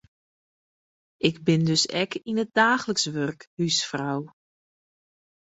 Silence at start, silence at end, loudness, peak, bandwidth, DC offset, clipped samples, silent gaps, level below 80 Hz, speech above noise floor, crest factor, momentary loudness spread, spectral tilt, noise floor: 1.25 s; 1.3 s; -24 LUFS; -6 dBFS; 8.2 kHz; under 0.1%; under 0.1%; 3.47-3.57 s; -66 dBFS; over 65 dB; 22 dB; 10 LU; -4 dB/octave; under -90 dBFS